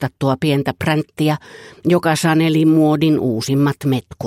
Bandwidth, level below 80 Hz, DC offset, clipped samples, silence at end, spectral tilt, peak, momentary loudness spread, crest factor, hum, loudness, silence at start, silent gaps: 15.5 kHz; -52 dBFS; under 0.1%; under 0.1%; 0 s; -6.5 dB/octave; -2 dBFS; 6 LU; 14 dB; none; -17 LUFS; 0 s; none